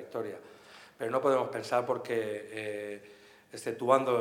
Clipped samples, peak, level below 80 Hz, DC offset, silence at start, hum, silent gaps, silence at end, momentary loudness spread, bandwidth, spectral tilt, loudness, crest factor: under 0.1%; -8 dBFS; -84 dBFS; under 0.1%; 0 s; none; none; 0 s; 21 LU; 16.5 kHz; -5 dB/octave; -32 LUFS; 24 dB